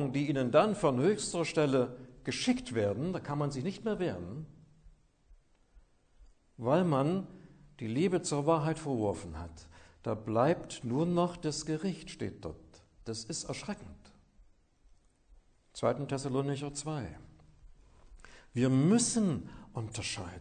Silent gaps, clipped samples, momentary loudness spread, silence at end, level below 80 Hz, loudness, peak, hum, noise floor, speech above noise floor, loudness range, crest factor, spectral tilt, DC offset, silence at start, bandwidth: none; under 0.1%; 16 LU; 0 s; -60 dBFS; -33 LUFS; -12 dBFS; none; -64 dBFS; 32 dB; 8 LU; 22 dB; -5.5 dB/octave; under 0.1%; 0 s; 9.6 kHz